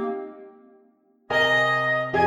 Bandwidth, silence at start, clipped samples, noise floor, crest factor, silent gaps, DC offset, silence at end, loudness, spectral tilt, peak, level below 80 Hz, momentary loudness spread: 15 kHz; 0 s; under 0.1%; -60 dBFS; 16 dB; none; under 0.1%; 0 s; -21 LUFS; -4.5 dB/octave; -8 dBFS; -60 dBFS; 15 LU